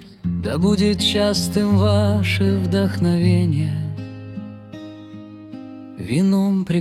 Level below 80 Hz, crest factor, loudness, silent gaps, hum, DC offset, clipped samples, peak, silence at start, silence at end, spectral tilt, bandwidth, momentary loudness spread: -48 dBFS; 14 dB; -19 LUFS; none; none; under 0.1%; under 0.1%; -6 dBFS; 0 s; 0 s; -6 dB/octave; 14.5 kHz; 19 LU